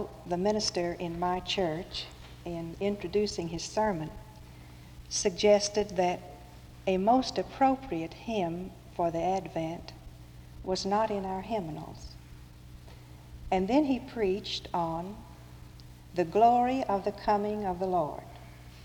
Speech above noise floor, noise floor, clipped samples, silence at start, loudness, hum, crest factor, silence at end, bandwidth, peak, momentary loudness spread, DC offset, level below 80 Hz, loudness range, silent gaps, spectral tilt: 20 dB; -49 dBFS; under 0.1%; 0 s; -30 LUFS; none; 20 dB; 0 s; over 20 kHz; -12 dBFS; 24 LU; under 0.1%; -52 dBFS; 5 LU; none; -4.5 dB/octave